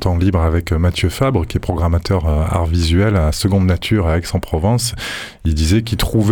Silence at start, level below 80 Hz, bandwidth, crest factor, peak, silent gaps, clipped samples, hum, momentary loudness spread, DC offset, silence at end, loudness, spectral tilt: 0 s; -24 dBFS; 19 kHz; 12 dB; -4 dBFS; none; under 0.1%; none; 5 LU; under 0.1%; 0 s; -17 LUFS; -6 dB/octave